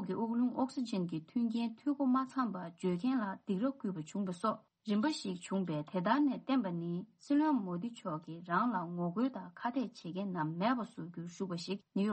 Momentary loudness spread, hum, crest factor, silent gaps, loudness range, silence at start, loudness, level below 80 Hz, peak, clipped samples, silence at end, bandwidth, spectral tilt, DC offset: 9 LU; none; 18 dB; none; 2 LU; 0 s; -36 LUFS; -80 dBFS; -16 dBFS; under 0.1%; 0 s; 8.4 kHz; -6.5 dB/octave; under 0.1%